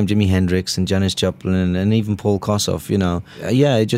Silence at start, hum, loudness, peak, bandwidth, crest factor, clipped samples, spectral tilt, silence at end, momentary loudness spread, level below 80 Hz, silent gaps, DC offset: 0 s; none; -18 LUFS; -2 dBFS; 16 kHz; 14 dB; under 0.1%; -6 dB/octave; 0 s; 4 LU; -44 dBFS; none; under 0.1%